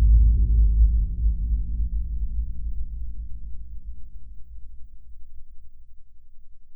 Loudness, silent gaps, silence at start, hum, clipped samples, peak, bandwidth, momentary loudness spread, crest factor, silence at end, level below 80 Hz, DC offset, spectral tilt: -25 LUFS; none; 0 s; none; under 0.1%; -8 dBFS; 0.4 kHz; 26 LU; 14 dB; 0 s; -24 dBFS; 1%; -14 dB/octave